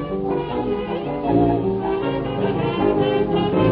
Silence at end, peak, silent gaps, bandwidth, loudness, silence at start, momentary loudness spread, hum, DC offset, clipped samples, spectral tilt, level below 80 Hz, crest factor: 0 s; -6 dBFS; none; 5 kHz; -21 LUFS; 0 s; 6 LU; none; under 0.1%; under 0.1%; -11.5 dB/octave; -40 dBFS; 14 dB